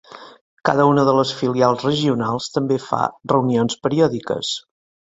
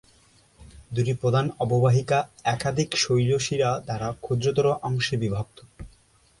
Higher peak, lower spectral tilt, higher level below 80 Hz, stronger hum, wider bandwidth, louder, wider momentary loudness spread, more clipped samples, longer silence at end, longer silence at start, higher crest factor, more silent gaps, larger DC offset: first, -2 dBFS vs -10 dBFS; about the same, -6 dB/octave vs -5.5 dB/octave; about the same, -56 dBFS vs -52 dBFS; neither; second, 8 kHz vs 11.5 kHz; first, -19 LUFS vs -24 LUFS; about the same, 8 LU vs 8 LU; neither; about the same, 0.55 s vs 0.55 s; second, 0.1 s vs 0.6 s; about the same, 18 dB vs 16 dB; first, 0.41-0.57 s vs none; neither